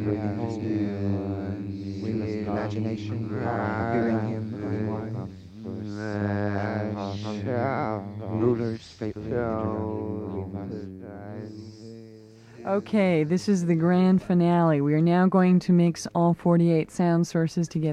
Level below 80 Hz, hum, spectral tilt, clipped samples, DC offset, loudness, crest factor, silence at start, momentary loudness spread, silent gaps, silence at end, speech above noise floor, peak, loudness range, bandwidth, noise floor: -58 dBFS; none; -8 dB/octave; under 0.1%; under 0.1%; -26 LUFS; 16 dB; 0 s; 15 LU; none; 0 s; 25 dB; -10 dBFS; 10 LU; 9.8 kHz; -48 dBFS